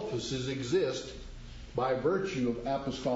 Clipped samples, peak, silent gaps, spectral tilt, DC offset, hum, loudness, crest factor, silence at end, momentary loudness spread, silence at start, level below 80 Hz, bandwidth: under 0.1%; -18 dBFS; none; -5.5 dB/octave; under 0.1%; none; -32 LUFS; 14 dB; 0 s; 15 LU; 0 s; -50 dBFS; 8 kHz